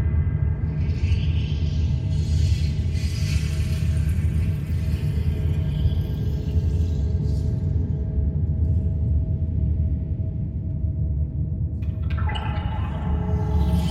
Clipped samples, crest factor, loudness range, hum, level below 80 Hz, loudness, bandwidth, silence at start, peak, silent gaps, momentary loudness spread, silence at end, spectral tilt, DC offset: under 0.1%; 12 dB; 2 LU; none; -26 dBFS; -24 LUFS; 11.5 kHz; 0 s; -10 dBFS; none; 4 LU; 0 s; -7.5 dB/octave; under 0.1%